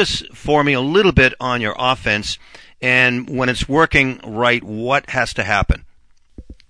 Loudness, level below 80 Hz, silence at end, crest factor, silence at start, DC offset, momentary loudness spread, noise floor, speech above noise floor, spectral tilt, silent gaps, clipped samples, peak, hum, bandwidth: -16 LUFS; -32 dBFS; 0.15 s; 18 dB; 0 s; under 0.1%; 8 LU; -49 dBFS; 32 dB; -5 dB/octave; none; under 0.1%; 0 dBFS; none; 10.5 kHz